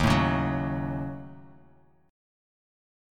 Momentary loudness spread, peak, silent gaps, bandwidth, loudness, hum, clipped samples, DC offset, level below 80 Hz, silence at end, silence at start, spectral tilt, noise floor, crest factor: 18 LU; -10 dBFS; none; 16 kHz; -28 LUFS; none; under 0.1%; under 0.1%; -42 dBFS; 1 s; 0 s; -6.5 dB/octave; -60 dBFS; 20 dB